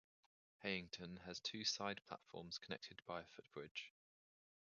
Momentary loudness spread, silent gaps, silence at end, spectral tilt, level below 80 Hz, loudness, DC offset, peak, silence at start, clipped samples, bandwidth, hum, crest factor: 12 LU; 3.71-3.75 s; 0.85 s; -2 dB/octave; -78 dBFS; -48 LUFS; under 0.1%; -26 dBFS; 0.6 s; under 0.1%; 7 kHz; none; 24 dB